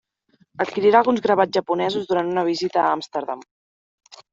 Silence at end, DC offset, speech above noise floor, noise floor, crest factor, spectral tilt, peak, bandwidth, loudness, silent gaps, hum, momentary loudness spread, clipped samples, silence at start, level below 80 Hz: 0.15 s; under 0.1%; 42 dB; -62 dBFS; 20 dB; -5.5 dB/octave; -2 dBFS; 7.8 kHz; -20 LUFS; 3.51-3.98 s; none; 12 LU; under 0.1%; 0.6 s; -66 dBFS